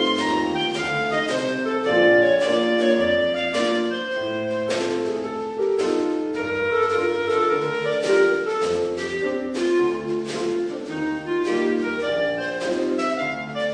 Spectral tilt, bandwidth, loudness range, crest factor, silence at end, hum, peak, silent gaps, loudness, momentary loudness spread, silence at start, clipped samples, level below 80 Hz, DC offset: -4.5 dB/octave; 10.5 kHz; 4 LU; 16 dB; 0 s; none; -6 dBFS; none; -22 LUFS; 7 LU; 0 s; under 0.1%; -58 dBFS; under 0.1%